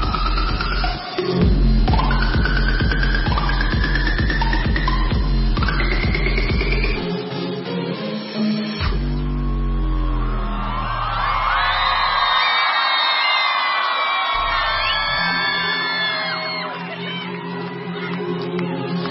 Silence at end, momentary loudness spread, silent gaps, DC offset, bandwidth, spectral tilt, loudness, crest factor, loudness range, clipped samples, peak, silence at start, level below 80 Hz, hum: 0 s; 9 LU; none; under 0.1%; 5.8 kHz; -9 dB/octave; -20 LUFS; 14 dB; 7 LU; under 0.1%; -6 dBFS; 0 s; -22 dBFS; none